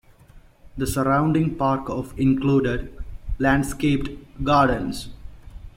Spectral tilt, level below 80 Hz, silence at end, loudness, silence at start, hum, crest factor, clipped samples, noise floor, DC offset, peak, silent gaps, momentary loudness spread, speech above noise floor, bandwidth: -6.5 dB/octave; -36 dBFS; 0.1 s; -22 LUFS; 0.35 s; none; 18 dB; under 0.1%; -49 dBFS; under 0.1%; -6 dBFS; none; 16 LU; 28 dB; 16.5 kHz